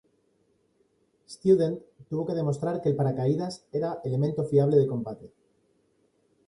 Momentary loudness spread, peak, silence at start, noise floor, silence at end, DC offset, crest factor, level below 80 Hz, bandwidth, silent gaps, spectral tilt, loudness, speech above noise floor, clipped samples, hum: 12 LU; -10 dBFS; 1.3 s; -69 dBFS; 1.2 s; under 0.1%; 18 dB; -66 dBFS; 11 kHz; none; -8.5 dB/octave; -27 LUFS; 43 dB; under 0.1%; none